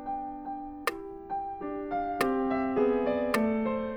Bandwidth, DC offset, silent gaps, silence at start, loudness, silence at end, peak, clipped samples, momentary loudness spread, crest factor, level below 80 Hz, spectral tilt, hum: 20 kHz; under 0.1%; none; 0 s; -31 LUFS; 0 s; -12 dBFS; under 0.1%; 11 LU; 18 dB; -54 dBFS; -5.5 dB/octave; none